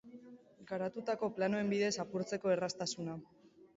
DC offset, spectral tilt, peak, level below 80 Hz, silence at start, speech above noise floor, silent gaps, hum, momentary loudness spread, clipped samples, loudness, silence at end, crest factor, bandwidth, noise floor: under 0.1%; -4.5 dB/octave; -22 dBFS; -76 dBFS; 0.05 s; 21 dB; none; none; 11 LU; under 0.1%; -37 LUFS; 0.3 s; 16 dB; 7.6 kHz; -57 dBFS